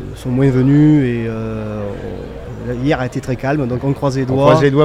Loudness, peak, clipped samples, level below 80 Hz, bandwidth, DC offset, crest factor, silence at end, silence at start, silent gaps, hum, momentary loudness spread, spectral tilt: -15 LUFS; 0 dBFS; under 0.1%; -36 dBFS; 11 kHz; under 0.1%; 14 dB; 0 s; 0 s; none; none; 15 LU; -8 dB/octave